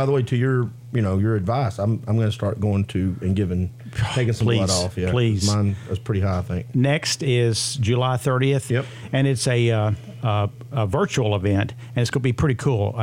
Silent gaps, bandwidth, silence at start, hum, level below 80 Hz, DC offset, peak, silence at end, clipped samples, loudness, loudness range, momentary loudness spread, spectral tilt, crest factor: none; 15.5 kHz; 0 s; none; -50 dBFS; under 0.1%; -6 dBFS; 0 s; under 0.1%; -22 LUFS; 2 LU; 6 LU; -6 dB/octave; 14 dB